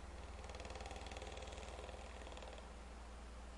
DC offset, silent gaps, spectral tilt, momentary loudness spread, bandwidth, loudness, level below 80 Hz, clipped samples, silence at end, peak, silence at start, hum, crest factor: under 0.1%; none; -4 dB/octave; 5 LU; 11.5 kHz; -52 LUFS; -54 dBFS; under 0.1%; 0 s; -34 dBFS; 0 s; none; 18 dB